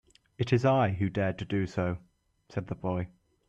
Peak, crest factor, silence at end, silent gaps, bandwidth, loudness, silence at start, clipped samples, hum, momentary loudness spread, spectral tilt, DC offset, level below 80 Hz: -12 dBFS; 18 dB; 0.4 s; none; 8.2 kHz; -30 LUFS; 0.4 s; under 0.1%; none; 14 LU; -8 dB/octave; under 0.1%; -58 dBFS